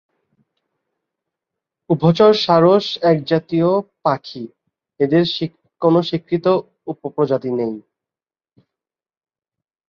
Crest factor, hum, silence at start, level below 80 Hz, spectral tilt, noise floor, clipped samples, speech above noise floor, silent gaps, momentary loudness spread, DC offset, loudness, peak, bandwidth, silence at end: 18 dB; none; 1.9 s; -60 dBFS; -7.5 dB/octave; under -90 dBFS; under 0.1%; over 74 dB; none; 16 LU; under 0.1%; -17 LUFS; -2 dBFS; 7 kHz; 2.1 s